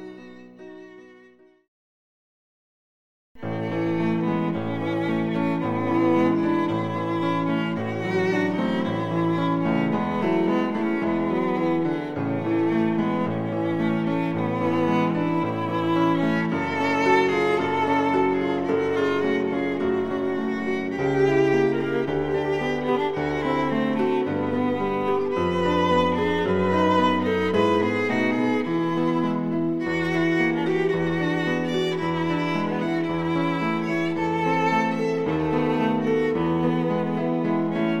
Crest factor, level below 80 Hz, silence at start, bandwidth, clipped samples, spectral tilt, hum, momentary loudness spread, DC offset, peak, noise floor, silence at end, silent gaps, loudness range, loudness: 16 dB; -56 dBFS; 0 s; 9.4 kHz; under 0.1%; -7.5 dB/octave; none; 5 LU; under 0.1%; -8 dBFS; -54 dBFS; 0 s; 1.68-3.35 s; 2 LU; -23 LUFS